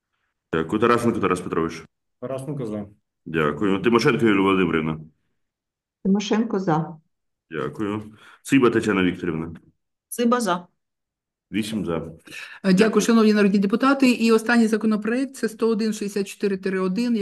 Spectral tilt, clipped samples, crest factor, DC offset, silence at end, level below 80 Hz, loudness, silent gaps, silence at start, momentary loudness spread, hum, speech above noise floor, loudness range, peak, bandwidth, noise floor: -6 dB/octave; under 0.1%; 18 dB; under 0.1%; 0 s; -58 dBFS; -22 LUFS; none; 0.5 s; 14 LU; none; 65 dB; 7 LU; -4 dBFS; 12.5 kHz; -86 dBFS